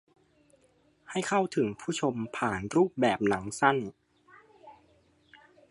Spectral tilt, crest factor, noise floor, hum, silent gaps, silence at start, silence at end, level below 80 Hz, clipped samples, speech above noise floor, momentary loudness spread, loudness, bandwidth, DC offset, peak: -5 dB/octave; 24 dB; -66 dBFS; none; none; 1.1 s; 1 s; -64 dBFS; under 0.1%; 38 dB; 7 LU; -29 LUFS; 11.5 kHz; under 0.1%; -8 dBFS